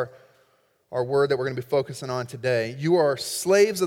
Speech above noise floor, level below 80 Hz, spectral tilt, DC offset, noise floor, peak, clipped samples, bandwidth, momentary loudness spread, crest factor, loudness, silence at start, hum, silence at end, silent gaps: 41 dB; -68 dBFS; -5 dB/octave; under 0.1%; -64 dBFS; -8 dBFS; under 0.1%; 17 kHz; 10 LU; 16 dB; -24 LUFS; 0 s; none; 0 s; none